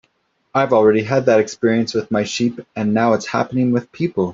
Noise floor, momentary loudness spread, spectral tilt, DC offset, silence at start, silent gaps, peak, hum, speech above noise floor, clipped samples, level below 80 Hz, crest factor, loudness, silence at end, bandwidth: -64 dBFS; 7 LU; -6 dB/octave; under 0.1%; 0.55 s; none; -2 dBFS; none; 47 dB; under 0.1%; -58 dBFS; 14 dB; -18 LUFS; 0 s; 7.8 kHz